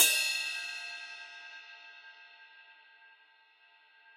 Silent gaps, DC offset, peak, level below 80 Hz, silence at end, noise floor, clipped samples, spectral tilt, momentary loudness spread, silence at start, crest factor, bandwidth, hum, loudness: none; under 0.1%; -8 dBFS; under -90 dBFS; 1.45 s; -64 dBFS; under 0.1%; 4.5 dB/octave; 25 LU; 0 s; 28 dB; 15.5 kHz; none; -32 LUFS